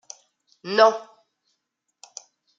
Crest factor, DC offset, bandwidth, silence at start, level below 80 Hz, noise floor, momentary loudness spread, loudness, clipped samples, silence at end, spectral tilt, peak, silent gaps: 24 dB; under 0.1%; 7.8 kHz; 0.65 s; -82 dBFS; -78 dBFS; 26 LU; -19 LUFS; under 0.1%; 1.55 s; -2.5 dB/octave; -2 dBFS; none